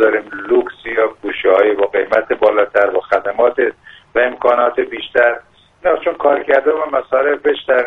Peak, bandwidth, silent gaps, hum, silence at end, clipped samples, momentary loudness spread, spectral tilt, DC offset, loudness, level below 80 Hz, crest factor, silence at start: 0 dBFS; 5.6 kHz; none; none; 0 s; under 0.1%; 6 LU; -5.5 dB/octave; under 0.1%; -15 LUFS; -52 dBFS; 14 dB; 0 s